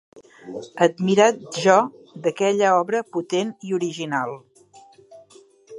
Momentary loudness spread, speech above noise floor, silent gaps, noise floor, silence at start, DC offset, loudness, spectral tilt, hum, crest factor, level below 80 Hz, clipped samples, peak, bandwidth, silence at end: 14 LU; 30 dB; none; -51 dBFS; 0.45 s; under 0.1%; -21 LUFS; -4.5 dB/octave; none; 20 dB; -74 dBFS; under 0.1%; -2 dBFS; 11.5 kHz; 0 s